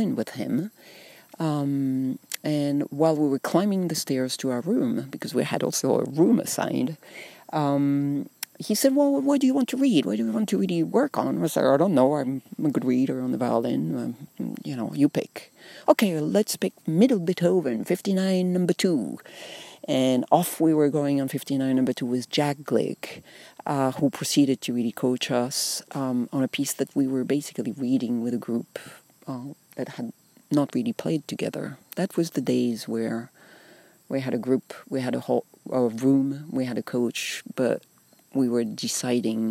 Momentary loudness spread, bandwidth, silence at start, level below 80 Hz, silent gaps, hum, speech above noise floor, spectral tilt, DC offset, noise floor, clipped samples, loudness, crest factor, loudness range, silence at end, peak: 13 LU; 16 kHz; 0 s; -76 dBFS; none; none; 29 dB; -5.5 dB/octave; under 0.1%; -54 dBFS; under 0.1%; -25 LUFS; 20 dB; 5 LU; 0 s; -4 dBFS